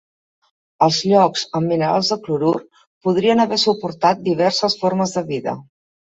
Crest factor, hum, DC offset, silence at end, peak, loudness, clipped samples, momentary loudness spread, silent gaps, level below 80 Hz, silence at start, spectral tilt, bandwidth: 18 dB; none; under 0.1%; 0.5 s; -2 dBFS; -18 LUFS; under 0.1%; 9 LU; 2.87-3.01 s; -62 dBFS; 0.8 s; -5 dB/octave; 8.2 kHz